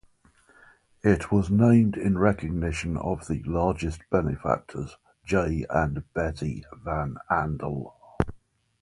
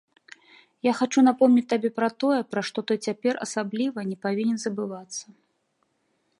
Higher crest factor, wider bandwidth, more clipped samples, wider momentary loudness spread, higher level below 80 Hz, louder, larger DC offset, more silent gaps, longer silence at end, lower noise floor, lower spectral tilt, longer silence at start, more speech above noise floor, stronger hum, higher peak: about the same, 22 dB vs 18 dB; about the same, 11.5 kHz vs 11.5 kHz; neither; about the same, 13 LU vs 12 LU; first, -40 dBFS vs -76 dBFS; about the same, -26 LUFS vs -25 LUFS; neither; neither; second, 0.45 s vs 1.15 s; second, -60 dBFS vs -72 dBFS; first, -8 dB/octave vs -5 dB/octave; first, 1.05 s vs 0.85 s; second, 35 dB vs 48 dB; neither; first, -4 dBFS vs -8 dBFS